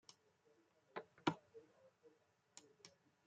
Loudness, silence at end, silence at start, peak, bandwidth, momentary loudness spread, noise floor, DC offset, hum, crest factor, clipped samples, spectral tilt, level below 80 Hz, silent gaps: -47 LUFS; 0.4 s; 0.95 s; -20 dBFS; 9 kHz; 21 LU; -76 dBFS; under 0.1%; none; 32 dB; under 0.1%; -5 dB/octave; -88 dBFS; none